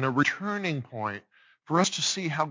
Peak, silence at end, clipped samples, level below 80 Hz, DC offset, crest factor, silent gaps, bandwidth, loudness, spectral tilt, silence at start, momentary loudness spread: -8 dBFS; 0 s; under 0.1%; -70 dBFS; under 0.1%; 20 dB; none; 7.8 kHz; -28 LUFS; -3.5 dB/octave; 0 s; 9 LU